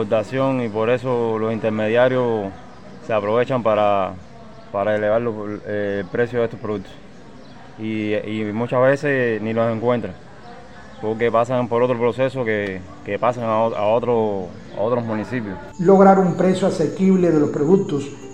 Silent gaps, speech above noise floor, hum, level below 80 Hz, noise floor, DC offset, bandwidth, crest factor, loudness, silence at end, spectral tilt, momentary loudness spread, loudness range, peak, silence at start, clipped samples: none; 23 dB; none; -54 dBFS; -42 dBFS; 0.7%; 9.2 kHz; 18 dB; -20 LUFS; 0 s; -7.5 dB/octave; 12 LU; 6 LU; -2 dBFS; 0 s; under 0.1%